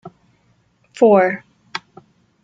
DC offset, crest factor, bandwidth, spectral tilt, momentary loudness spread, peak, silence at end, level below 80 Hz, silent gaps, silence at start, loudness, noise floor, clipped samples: under 0.1%; 18 dB; 7.8 kHz; -6.5 dB/octave; 19 LU; -2 dBFS; 0.65 s; -66 dBFS; none; 0.05 s; -14 LUFS; -60 dBFS; under 0.1%